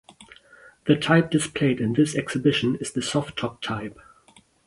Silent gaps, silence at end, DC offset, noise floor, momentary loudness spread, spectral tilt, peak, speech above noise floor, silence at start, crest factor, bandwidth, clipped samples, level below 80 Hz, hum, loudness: none; 0.75 s; under 0.1%; -57 dBFS; 11 LU; -5.5 dB/octave; -4 dBFS; 34 dB; 0.2 s; 20 dB; 11.5 kHz; under 0.1%; -56 dBFS; none; -23 LUFS